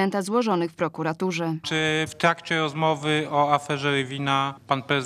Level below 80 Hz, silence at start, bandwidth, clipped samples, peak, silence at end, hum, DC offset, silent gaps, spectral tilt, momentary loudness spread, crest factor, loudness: -68 dBFS; 0 s; 14 kHz; under 0.1%; -4 dBFS; 0 s; none; under 0.1%; none; -5 dB/octave; 5 LU; 20 dB; -24 LUFS